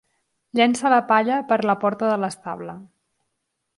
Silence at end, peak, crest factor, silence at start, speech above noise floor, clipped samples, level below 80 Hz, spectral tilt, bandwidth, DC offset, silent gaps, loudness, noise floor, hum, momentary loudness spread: 0.95 s; -4 dBFS; 18 dB; 0.55 s; 57 dB; under 0.1%; -70 dBFS; -4.5 dB/octave; 11.5 kHz; under 0.1%; none; -20 LUFS; -77 dBFS; none; 15 LU